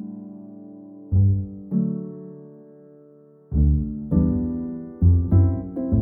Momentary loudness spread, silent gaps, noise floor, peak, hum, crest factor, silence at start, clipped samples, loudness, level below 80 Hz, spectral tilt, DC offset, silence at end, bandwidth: 22 LU; none; -50 dBFS; -6 dBFS; none; 16 dB; 0 s; under 0.1%; -22 LUFS; -30 dBFS; -16 dB/octave; under 0.1%; 0 s; 1.7 kHz